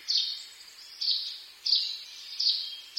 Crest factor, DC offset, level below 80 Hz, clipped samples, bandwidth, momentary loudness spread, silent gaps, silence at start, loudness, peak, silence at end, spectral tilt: 20 dB; under 0.1%; -82 dBFS; under 0.1%; 16 kHz; 17 LU; none; 0 s; -28 LUFS; -12 dBFS; 0 s; 4 dB/octave